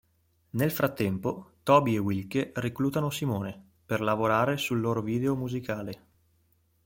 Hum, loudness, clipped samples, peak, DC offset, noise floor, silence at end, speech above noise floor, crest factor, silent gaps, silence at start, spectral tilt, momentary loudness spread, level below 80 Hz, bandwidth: none; -28 LUFS; under 0.1%; -8 dBFS; under 0.1%; -69 dBFS; 0.9 s; 42 dB; 22 dB; none; 0.55 s; -6.5 dB/octave; 12 LU; -62 dBFS; 16.5 kHz